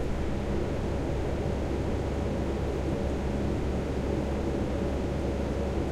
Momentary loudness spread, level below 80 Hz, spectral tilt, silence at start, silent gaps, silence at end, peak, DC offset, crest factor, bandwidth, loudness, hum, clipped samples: 1 LU; -34 dBFS; -7.5 dB/octave; 0 s; none; 0 s; -18 dBFS; under 0.1%; 12 dB; 12 kHz; -31 LUFS; none; under 0.1%